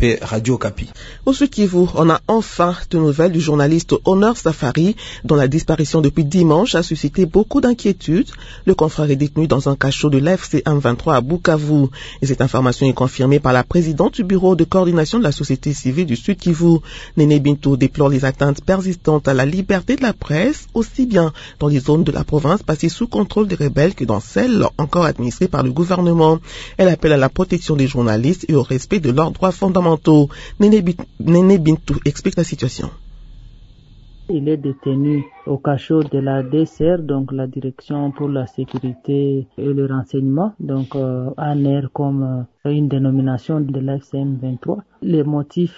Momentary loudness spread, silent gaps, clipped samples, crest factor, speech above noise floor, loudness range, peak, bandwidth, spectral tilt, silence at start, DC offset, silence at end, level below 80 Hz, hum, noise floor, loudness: 8 LU; none; under 0.1%; 16 dB; 27 dB; 5 LU; 0 dBFS; 8 kHz; -7 dB/octave; 0 s; under 0.1%; 0.05 s; -38 dBFS; none; -43 dBFS; -17 LUFS